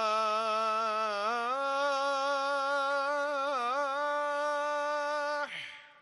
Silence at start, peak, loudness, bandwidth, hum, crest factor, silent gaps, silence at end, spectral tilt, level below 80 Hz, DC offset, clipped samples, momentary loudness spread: 0 s; -18 dBFS; -31 LUFS; 12 kHz; none; 12 dB; none; 0.1 s; -1.5 dB/octave; -88 dBFS; under 0.1%; under 0.1%; 3 LU